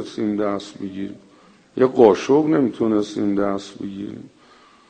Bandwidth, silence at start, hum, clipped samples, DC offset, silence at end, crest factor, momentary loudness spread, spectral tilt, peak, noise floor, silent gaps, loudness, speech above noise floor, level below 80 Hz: 9.2 kHz; 0 s; none; under 0.1%; under 0.1%; 0.65 s; 20 dB; 19 LU; -6.5 dB/octave; 0 dBFS; -51 dBFS; none; -19 LUFS; 31 dB; -58 dBFS